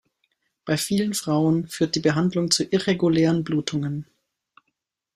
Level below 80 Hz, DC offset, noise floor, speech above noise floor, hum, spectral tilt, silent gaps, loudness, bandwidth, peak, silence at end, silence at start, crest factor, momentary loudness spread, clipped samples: -60 dBFS; under 0.1%; -78 dBFS; 56 dB; none; -5 dB/octave; none; -22 LUFS; 15.5 kHz; -4 dBFS; 1.15 s; 0.65 s; 20 dB; 7 LU; under 0.1%